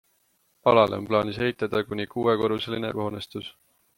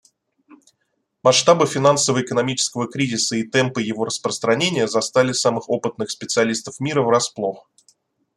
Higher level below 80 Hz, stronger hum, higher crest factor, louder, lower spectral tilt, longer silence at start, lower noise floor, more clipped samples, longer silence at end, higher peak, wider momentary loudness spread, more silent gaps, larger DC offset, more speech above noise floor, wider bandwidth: about the same, -60 dBFS vs -64 dBFS; neither; about the same, 22 dB vs 20 dB; second, -25 LUFS vs -19 LUFS; first, -6.5 dB/octave vs -3.5 dB/octave; second, 0.65 s vs 1.25 s; second, -68 dBFS vs -72 dBFS; neither; second, 0.45 s vs 0.75 s; second, -4 dBFS vs 0 dBFS; first, 14 LU vs 8 LU; neither; neither; second, 43 dB vs 53 dB; first, 16.5 kHz vs 13 kHz